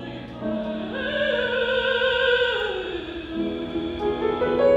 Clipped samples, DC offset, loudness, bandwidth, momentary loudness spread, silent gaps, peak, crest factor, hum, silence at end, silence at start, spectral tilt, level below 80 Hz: under 0.1%; under 0.1%; -24 LUFS; 7.8 kHz; 10 LU; none; -8 dBFS; 16 dB; none; 0 s; 0 s; -6 dB/octave; -48 dBFS